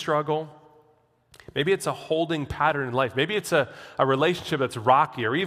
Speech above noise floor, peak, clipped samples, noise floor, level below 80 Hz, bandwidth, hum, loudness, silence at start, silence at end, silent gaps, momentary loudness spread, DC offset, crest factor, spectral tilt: 39 dB; -6 dBFS; under 0.1%; -63 dBFS; -56 dBFS; 15.5 kHz; none; -25 LUFS; 0 s; 0 s; none; 8 LU; under 0.1%; 20 dB; -5 dB/octave